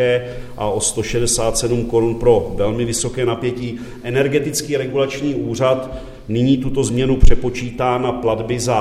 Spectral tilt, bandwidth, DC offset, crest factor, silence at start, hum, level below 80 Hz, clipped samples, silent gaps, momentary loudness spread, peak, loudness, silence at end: -5 dB/octave; 14 kHz; under 0.1%; 16 dB; 0 s; none; -24 dBFS; under 0.1%; none; 7 LU; 0 dBFS; -18 LUFS; 0 s